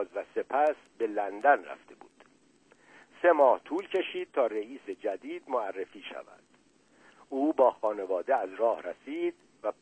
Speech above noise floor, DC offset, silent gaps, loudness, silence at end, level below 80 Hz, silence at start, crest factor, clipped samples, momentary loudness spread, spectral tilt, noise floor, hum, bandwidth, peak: 35 dB; under 0.1%; none; -30 LUFS; 0.1 s; -80 dBFS; 0 s; 20 dB; under 0.1%; 15 LU; -5 dB/octave; -64 dBFS; none; 9 kHz; -10 dBFS